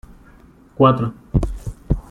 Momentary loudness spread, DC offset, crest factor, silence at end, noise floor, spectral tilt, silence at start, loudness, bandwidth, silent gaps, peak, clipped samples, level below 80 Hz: 13 LU; under 0.1%; 18 dB; 0.1 s; -47 dBFS; -8.5 dB/octave; 0.1 s; -19 LUFS; 11 kHz; none; -2 dBFS; under 0.1%; -30 dBFS